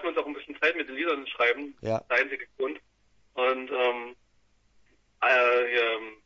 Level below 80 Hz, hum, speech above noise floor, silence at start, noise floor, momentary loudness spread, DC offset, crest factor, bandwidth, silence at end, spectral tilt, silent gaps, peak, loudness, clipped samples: -68 dBFS; none; 38 dB; 0 s; -66 dBFS; 12 LU; under 0.1%; 20 dB; 7.2 kHz; 0.1 s; -5 dB/octave; none; -8 dBFS; -27 LUFS; under 0.1%